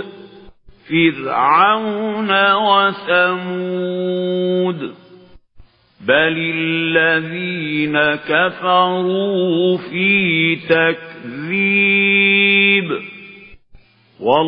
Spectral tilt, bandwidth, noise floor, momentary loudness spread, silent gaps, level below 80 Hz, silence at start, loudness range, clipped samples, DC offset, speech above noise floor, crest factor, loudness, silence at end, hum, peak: -9 dB/octave; 5.2 kHz; -46 dBFS; 11 LU; none; -56 dBFS; 0 s; 5 LU; under 0.1%; under 0.1%; 30 dB; 16 dB; -15 LUFS; 0 s; none; 0 dBFS